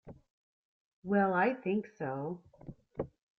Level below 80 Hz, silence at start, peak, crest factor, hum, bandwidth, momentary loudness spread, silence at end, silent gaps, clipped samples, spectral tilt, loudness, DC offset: -66 dBFS; 0.05 s; -18 dBFS; 18 dB; none; 6 kHz; 20 LU; 0.35 s; 0.30-1.02 s; under 0.1%; -9.5 dB/octave; -34 LUFS; under 0.1%